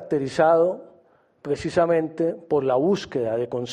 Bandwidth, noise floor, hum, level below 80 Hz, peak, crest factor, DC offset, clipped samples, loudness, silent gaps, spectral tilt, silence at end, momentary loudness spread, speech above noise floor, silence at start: 10.5 kHz; -58 dBFS; none; -60 dBFS; -6 dBFS; 16 dB; under 0.1%; under 0.1%; -22 LUFS; none; -6.5 dB/octave; 0 s; 10 LU; 36 dB; 0 s